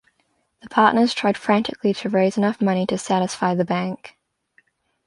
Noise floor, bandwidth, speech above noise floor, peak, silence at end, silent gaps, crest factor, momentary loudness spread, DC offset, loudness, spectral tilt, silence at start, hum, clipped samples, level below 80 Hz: -68 dBFS; 11.5 kHz; 48 dB; -2 dBFS; 0.95 s; none; 20 dB; 7 LU; under 0.1%; -20 LUFS; -5.5 dB/octave; 0.65 s; none; under 0.1%; -64 dBFS